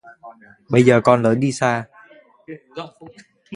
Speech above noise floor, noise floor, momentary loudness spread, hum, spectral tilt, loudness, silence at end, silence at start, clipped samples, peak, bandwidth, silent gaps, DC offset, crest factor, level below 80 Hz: 31 dB; -49 dBFS; 26 LU; none; -6.5 dB/octave; -17 LUFS; 0 s; 0.05 s; under 0.1%; 0 dBFS; 11 kHz; none; under 0.1%; 20 dB; -58 dBFS